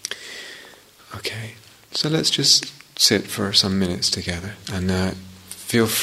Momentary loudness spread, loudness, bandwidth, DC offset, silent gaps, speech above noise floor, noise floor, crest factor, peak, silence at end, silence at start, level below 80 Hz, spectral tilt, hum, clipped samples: 20 LU; -20 LUFS; 16 kHz; under 0.1%; none; 25 dB; -47 dBFS; 22 dB; 0 dBFS; 0 s; 0.05 s; -52 dBFS; -3 dB/octave; none; under 0.1%